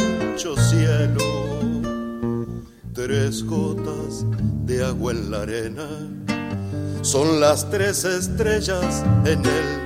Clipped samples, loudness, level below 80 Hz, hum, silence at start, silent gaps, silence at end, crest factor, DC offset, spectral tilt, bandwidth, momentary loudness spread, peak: under 0.1%; -22 LUFS; -38 dBFS; none; 0 s; none; 0 s; 18 dB; under 0.1%; -5.5 dB/octave; 16 kHz; 10 LU; -4 dBFS